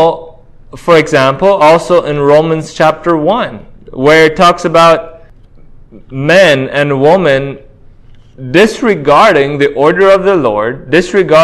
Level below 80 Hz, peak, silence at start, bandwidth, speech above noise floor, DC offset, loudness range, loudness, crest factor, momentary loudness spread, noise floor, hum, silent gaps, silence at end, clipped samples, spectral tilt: -40 dBFS; 0 dBFS; 0 s; 13 kHz; 28 dB; under 0.1%; 2 LU; -8 LUFS; 10 dB; 9 LU; -36 dBFS; none; none; 0 s; 2%; -5.5 dB/octave